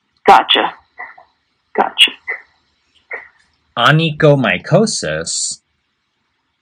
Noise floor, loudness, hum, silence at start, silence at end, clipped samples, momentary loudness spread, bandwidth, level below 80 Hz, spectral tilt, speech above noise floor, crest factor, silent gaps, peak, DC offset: -67 dBFS; -13 LUFS; none; 0.25 s; 1.05 s; 0.2%; 20 LU; 16 kHz; -54 dBFS; -3.5 dB/octave; 54 dB; 16 dB; none; 0 dBFS; under 0.1%